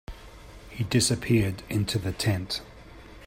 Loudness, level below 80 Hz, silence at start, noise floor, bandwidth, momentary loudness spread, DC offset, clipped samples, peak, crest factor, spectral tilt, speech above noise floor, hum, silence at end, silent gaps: -27 LUFS; -48 dBFS; 0.1 s; -47 dBFS; 16 kHz; 24 LU; under 0.1%; under 0.1%; -10 dBFS; 18 dB; -4.5 dB/octave; 21 dB; none; 0 s; none